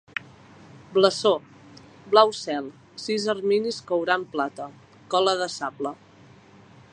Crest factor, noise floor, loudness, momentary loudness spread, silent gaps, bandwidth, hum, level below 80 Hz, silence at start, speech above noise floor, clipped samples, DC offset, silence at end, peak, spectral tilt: 22 dB; -51 dBFS; -24 LUFS; 16 LU; none; 11 kHz; none; -70 dBFS; 0.75 s; 28 dB; under 0.1%; under 0.1%; 1 s; -2 dBFS; -3.5 dB/octave